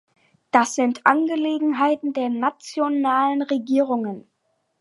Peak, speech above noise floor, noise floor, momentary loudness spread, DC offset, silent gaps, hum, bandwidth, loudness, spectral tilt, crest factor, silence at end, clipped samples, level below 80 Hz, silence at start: 0 dBFS; 50 dB; -71 dBFS; 7 LU; under 0.1%; none; none; 11.5 kHz; -21 LUFS; -4 dB/octave; 22 dB; 0.6 s; under 0.1%; -76 dBFS; 0.55 s